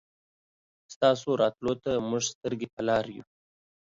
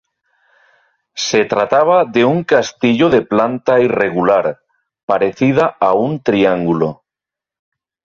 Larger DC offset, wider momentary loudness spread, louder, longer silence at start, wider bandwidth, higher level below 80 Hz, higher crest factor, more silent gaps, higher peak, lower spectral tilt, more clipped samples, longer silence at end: neither; first, 9 LU vs 6 LU; second, -28 LUFS vs -14 LUFS; second, 0.9 s vs 1.15 s; about the same, 7.8 kHz vs 7.6 kHz; second, -64 dBFS vs -54 dBFS; first, 20 dB vs 14 dB; first, 0.96-1.01 s, 2.35-2.41 s, 2.73-2.77 s vs 5.03-5.08 s; second, -10 dBFS vs -2 dBFS; about the same, -4.5 dB/octave vs -5.5 dB/octave; neither; second, 0.65 s vs 1.2 s